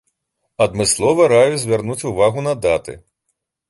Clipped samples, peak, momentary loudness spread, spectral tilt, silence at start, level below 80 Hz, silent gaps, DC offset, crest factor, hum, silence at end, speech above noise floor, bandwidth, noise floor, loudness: under 0.1%; -2 dBFS; 9 LU; -4 dB/octave; 0.6 s; -46 dBFS; none; under 0.1%; 16 dB; none; 0.7 s; 58 dB; 12 kHz; -73 dBFS; -16 LUFS